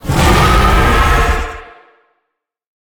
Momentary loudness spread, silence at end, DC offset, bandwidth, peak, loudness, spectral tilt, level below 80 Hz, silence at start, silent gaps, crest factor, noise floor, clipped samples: 13 LU; 1.2 s; under 0.1%; over 20 kHz; 0 dBFS; -11 LUFS; -5 dB/octave; -16 dBFS; 0.05 s; none; 12 dB; -74 dBFS; under 0.1%